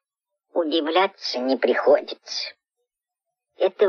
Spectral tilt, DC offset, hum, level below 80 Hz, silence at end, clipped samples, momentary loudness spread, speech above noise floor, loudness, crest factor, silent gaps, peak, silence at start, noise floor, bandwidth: -3 dB/octave; under 0.1%; none; -78 dBFS; 0 s; under 0.1%; 10 LU; 64 dB; -23 LUFS; 18 dB; none; -6 dBFS; 0.55 s; -85 dBFS; 7 kHz